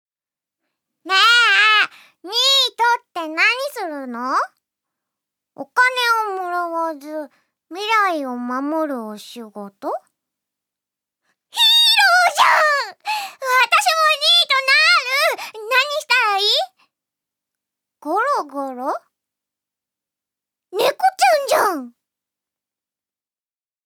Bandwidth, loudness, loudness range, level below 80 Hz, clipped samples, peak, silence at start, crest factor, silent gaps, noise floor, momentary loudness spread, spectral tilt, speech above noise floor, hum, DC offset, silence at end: over 20 kHz; -16 LUFS; 10 LU; -84 dBFS; under 0.1%; -2 dBFS; 1.05 s; 18 dB; none; under -90 dBFS; 18 LU; 0.5 dB/octave; over 69 dB; none; under 0.1%; 1.95 s